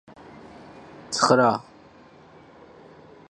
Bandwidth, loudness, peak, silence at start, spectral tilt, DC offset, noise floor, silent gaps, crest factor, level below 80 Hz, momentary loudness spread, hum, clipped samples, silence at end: 11.5 kHz; -21 LUFS; -4 dBFS; 1.1 s; -4 dB/octave; under 0.1%; -50 dBFS; none; 24 dB; -66 dBFS; 27 LU; none; under 0.1%; 1.7 s